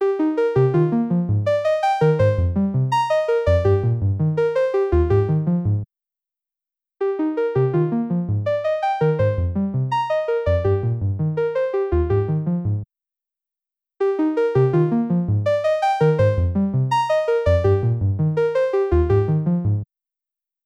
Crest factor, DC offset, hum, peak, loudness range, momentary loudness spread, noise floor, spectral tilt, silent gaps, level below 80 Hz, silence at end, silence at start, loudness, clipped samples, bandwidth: 12 dB; under 0.1%; none; -6 dBFS; 4 LU; 5 LU; -89 dBFS; -9 dB/octave; none; -36 dBFS; 0.8 s; 0 s; -20 LUFS; under 0.1%; 8.8 kHz